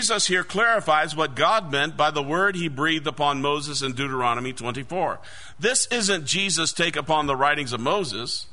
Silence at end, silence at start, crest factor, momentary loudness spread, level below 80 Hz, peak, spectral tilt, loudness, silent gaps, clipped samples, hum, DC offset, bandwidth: 0.1 s; 0 s; 18 dB; 7 LU; -54 dBFS; -6 dBFS; -2.5 dB/octave; -23 LUFS; none; under 0.1%; none; 1%; 11 kHz